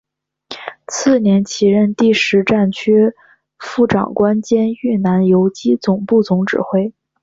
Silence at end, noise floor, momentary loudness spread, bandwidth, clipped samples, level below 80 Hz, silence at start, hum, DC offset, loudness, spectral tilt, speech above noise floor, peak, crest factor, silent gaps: 0.35 s; -38 dBFS; 12 LU; 7.8 kHz; under 0.1%; -52 dBFS; 0.5 s; none; under 0.1%; -15 LUFS; -6 dB/octave; 24 dB; -2 dBFS; 14 dB; none